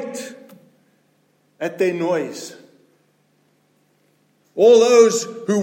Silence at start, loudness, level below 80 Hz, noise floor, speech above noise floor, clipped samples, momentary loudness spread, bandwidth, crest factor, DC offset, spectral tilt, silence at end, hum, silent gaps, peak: 0 s; -16 LUFS; -78 dBFS; -62 dBFS; 46 dB; under 0.1%; 23 LU; 16 kHz; 18 dB; under 0.1%; -4 dB/octave; 0 s; none; none; -2 dBFS